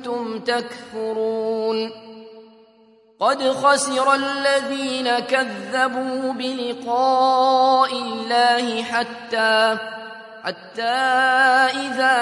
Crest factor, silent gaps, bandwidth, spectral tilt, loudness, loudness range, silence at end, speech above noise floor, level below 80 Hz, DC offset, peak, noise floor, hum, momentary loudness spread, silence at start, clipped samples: 18 dB; none; 11.5 kHz; -2 dB/octave; -20 LUFS; 4 LU; 0 s; 34 dB; -78 dBFS; under 0.1%; -4 dBFS; -53 dBFS; none; 11 LU; 0 s; under 0.1%